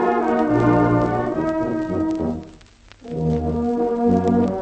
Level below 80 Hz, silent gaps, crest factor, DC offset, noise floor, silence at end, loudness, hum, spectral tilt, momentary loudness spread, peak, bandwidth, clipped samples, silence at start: -40 dBFS; none; 16 dB; under 0.1%; -47 dBFS; 0 s; -20 LUFS; none; -9 dB/octave; 8 LU; -4 dBFS; 8.4 kHz; under 0.1%; 0 s